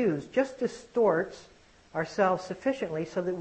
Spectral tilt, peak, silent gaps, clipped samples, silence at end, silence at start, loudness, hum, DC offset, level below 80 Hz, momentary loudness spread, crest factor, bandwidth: -6.5 dB/octave; -12 dBFS; none; under 0.1%; 0 s; 0 s; -30 LUFS; none; under 0.1%; -64 dBFS; 10 LU; 18 dB; 8.6 kHz